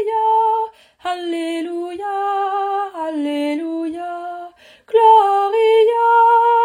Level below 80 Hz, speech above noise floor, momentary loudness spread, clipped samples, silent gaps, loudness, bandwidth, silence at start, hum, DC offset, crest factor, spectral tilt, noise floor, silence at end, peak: -68 dBFS; 18 dB; 15 LU; under 0.1%; none; -17 LUFS; 15 kHz; 0 s; none; under 0.1%; 14 dB; -3 dB/octave; -40 dBFS; 0 s; -2 dBFS